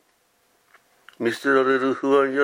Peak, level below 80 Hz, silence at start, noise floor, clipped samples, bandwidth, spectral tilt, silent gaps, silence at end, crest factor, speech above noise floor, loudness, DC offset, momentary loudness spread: -6 dBFS; -80 dBFS; 1.2 s; -65 dBFS; under 0.1%; 15.5 kHz; -5 dB/octave; none; 0 s; 18 dB; 45 dB; -21 LUFS; under 0.1%; 8 LU